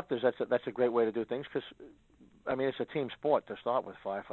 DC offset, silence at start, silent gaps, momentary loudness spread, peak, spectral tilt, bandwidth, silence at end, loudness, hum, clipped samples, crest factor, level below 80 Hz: under 0.1%; 0 s; none; 9 LU; -14 dBFS; -8 dB/octave; 4.3 kHz; 0 s; -33 LUFS; none; under 0.1%; 20 dB; -72 dBFS